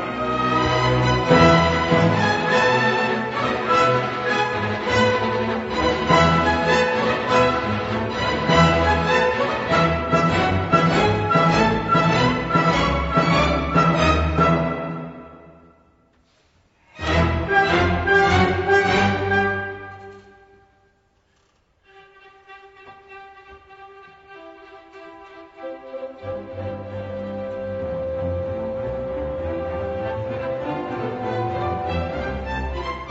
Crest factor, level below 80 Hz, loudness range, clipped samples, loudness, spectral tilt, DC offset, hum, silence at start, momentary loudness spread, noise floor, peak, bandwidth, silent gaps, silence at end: 20 dB; -38 dBFS; 13 LU; under 0.1%; -20 LUFS; -6 dB/octave; under 0.1%; none; 0 s; 13 LU; -63 dBFS; -2 dBFS; 8 kHz; none; 0 s